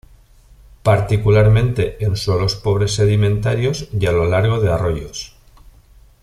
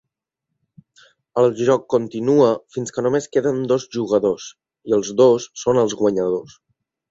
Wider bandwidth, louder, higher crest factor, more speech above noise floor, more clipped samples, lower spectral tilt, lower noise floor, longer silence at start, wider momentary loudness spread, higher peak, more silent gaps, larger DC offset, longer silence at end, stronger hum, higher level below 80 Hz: first, 12 kHz vs 8 kHz; about the same, -17 LUFS vs -19 LUFS; about the same, 14 dB vs 16 dB; second, 31 dB vs 62 dB; neither; about the same, -6.5 dB/octave vs -6 dB/octave; second, -47 dBFS vs -80 dBFS; second, 0.85 s vs 1.35 s; second, 8 LU vs 11 LU; about the same, -2 dBFS vs -4 dBFS; neither; neither; first, 0.95 s vs 0.65 s; neither; first, -34 dBFS vs -60 dBFS